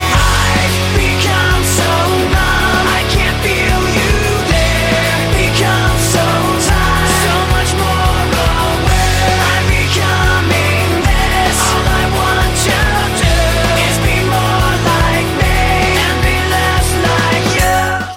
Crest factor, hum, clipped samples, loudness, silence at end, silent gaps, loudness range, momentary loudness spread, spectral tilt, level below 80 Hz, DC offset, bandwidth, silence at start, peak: 10 dB; none; under 0.1%; -12 LUFS; 0 s; none; 0 LU; 1 LU; -4 dB/octave; -18 dBFS; under 0.1%; 16.5 kHz; 0 s; -2 dBFS